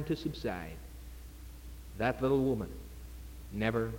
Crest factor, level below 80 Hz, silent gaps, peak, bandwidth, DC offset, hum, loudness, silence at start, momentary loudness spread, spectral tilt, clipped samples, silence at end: 20 dB; -48 dBFS; none; -16 dBFS; 17 kHz; under 0.1%; none; -34 LUFS; 0 s; 20 LU; -7 dB/octave; under 0.1%; 0 s